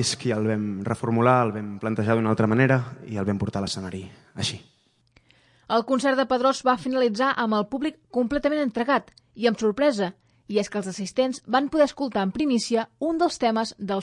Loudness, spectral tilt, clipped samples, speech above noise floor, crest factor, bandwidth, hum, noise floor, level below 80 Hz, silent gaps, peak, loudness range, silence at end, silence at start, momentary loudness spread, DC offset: -24 LUFS; -5.5 dB/octave; under 0.1%; 38 dB; 20 dB; 11.5 kHz; none; -62 dBFS; -58 dBFS; none; -4 dBFS; 3 LU; 0 s; 0 s; 9 LU; under 0.1%